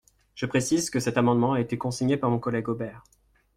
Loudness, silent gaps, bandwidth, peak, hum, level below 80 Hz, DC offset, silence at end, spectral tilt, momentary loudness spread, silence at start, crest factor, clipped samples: -26 LUFS; none; 15.5 kHz; -10 dBFS; none; -58 dBFS; under 0.1%; 0.55 s; -5.5 dB/octave; 10 LU; 0.35 s; 18 dB; under 0.1%